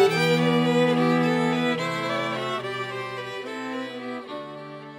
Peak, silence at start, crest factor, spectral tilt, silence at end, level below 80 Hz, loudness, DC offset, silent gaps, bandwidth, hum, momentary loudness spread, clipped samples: -6 dBFS; 0 s; 18 dB; -6 dB/octave; 0 s; -68 dBFS; -24 LUFS; under 0.1%; none; 16 kHz; none; 14 LU; under 0.1%